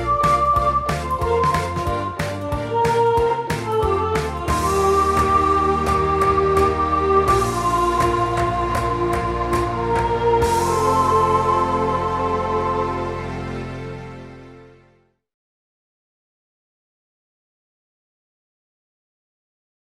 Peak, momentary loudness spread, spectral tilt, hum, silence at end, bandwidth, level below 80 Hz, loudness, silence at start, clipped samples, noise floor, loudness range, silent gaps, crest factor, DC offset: -4 dBFS; 9 LU; -6 dB/octave; none; 5.2 s; 16 kHz; -34 dBFS; -19 LUFS; 0 s; under 0.1%; -58 dBFS; 9 LU; none; 16 dB; under 0.1%